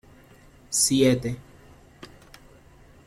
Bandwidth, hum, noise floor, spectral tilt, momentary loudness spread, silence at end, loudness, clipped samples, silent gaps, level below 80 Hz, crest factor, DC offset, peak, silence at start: 16 kHz; none; -52 dBFS; -4 dB/octave; 20 LU; 1.65 s; -22 LUFS; under 0.1%; none; -54 dBFS; 20 dB; under 0.1%; -8 dBFS; 0.7 s